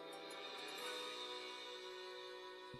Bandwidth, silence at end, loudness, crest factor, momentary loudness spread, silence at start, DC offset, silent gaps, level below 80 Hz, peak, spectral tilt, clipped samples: 15 kHz; 0 s; -49 LUFS; 14 dB; 6 LU; 0 s; under 0.1%; none; -84 dBFS; -36 dBFS; -2 dB/octave; under 0.1%